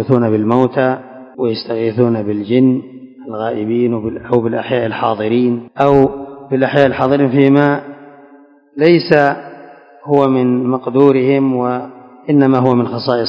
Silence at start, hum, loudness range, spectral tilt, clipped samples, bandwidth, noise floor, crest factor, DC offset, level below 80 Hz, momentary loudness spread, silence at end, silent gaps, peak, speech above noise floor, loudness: 0 s; none; 3 LU; -9 dB/octave; 0.4%; 6 kHz; -44 dBFS; 14 dB; under 0.1%; -50 dBFS; 14 LU; 0 s; none; 0 dBFS; 31 dB; -14 LUFS